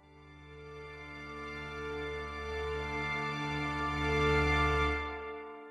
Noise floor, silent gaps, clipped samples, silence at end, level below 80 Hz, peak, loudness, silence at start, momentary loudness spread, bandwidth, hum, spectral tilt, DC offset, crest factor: -55 dBFS; none; under 0.1%; 0 s; -44 dBFS; -18 dBFS; -34 LUFS; 0.05 s; 18 LU; 11 kHz; none; -5.5 dB/octave; under 0.1%; 18 dB